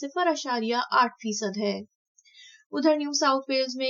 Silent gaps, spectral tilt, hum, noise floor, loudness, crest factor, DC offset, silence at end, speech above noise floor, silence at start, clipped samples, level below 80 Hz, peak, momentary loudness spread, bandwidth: 1.95-2.15 s, 2.66-2.70 s; -3 dB/octave; none; -54 dBFS; -26 LUFS; 18 dB; under 0.1%; 0 s; 28 dB; 0 s; under 0.1%; under -90 dBFS; -8 dBFS; 7 LU; 7.6 kHz